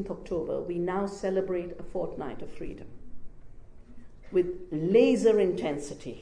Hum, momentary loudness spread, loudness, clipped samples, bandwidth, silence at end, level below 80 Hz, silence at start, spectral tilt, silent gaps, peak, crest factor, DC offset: none; 18 LU; -28 LUFS; under 0.1%; 10 kHz; 0 s; -50 dBFS; 0 s; -6.5 dB/octave; none; -10 dBFS; 18 dB; under 0.1%